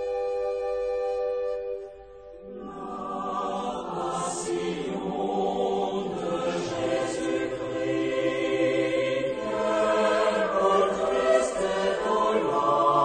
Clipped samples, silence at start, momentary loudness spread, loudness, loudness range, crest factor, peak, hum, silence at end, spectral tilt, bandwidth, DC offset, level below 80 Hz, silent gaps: under 0.1%; 0 s; 11 LU; -27 LUFS; 8 LU; 16 dB; -10 dBFS; none; 0 s; -4.5 dB/octave; 9.4 kHz; under 0.1%; -56 dBFS; none